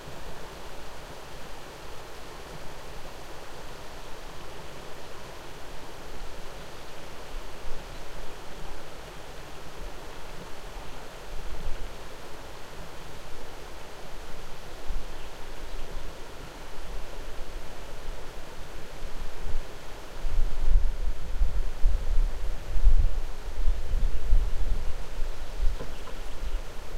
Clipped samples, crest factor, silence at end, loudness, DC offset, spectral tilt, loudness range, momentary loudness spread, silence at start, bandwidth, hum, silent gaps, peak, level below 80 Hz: under 0.1%; 18 dB; 0 s; -38 LUFS; under 0.1%; -4.5 dB/octave; 11 LU; 12 LU; 0 s; 9.4 kHz; none; none; -6 dBFS; -30 dBFS